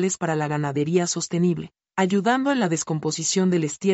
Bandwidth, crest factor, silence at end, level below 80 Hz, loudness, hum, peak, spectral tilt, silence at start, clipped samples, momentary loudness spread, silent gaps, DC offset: 8.2 kHz; 14 dB; 0 s; -64 dBFS; -23 LUFS; none; -8 dBFS; -5 dB/octave; 0 s; under 0.1%; 4 LU; none; under 0.1%